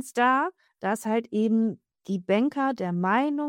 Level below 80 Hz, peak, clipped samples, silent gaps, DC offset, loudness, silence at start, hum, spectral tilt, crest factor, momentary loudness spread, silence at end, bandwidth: -76 dBFS; -10 dBFS; under 0.1%; none; under 0.1%; -26 LUFS; 0 s; none; -6 dB/octave; 16 dB; 10 LU; 0 s; 17 kHz